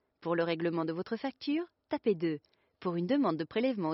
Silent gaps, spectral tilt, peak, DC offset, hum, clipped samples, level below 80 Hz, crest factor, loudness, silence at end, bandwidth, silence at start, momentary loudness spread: none; -5.5 dB/octave; -18 dBFS; under 0.1%; none; under 0.1%; -76 dBFS; 14 dB; -33 LUFS; 0 s; 5.8 kHz; 0.2 s; 7 LU